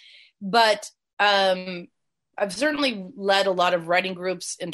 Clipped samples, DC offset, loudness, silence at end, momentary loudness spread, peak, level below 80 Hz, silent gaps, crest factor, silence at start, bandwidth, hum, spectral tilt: under 0.1%; under 0.1%; -22 LUFS; 0 s; 16 LU; -6 dBFS; -72 dBFS; 1.13-1.17 s; 20 dB; 0.4 s; 12.5 kHz; none; -3 dB/octave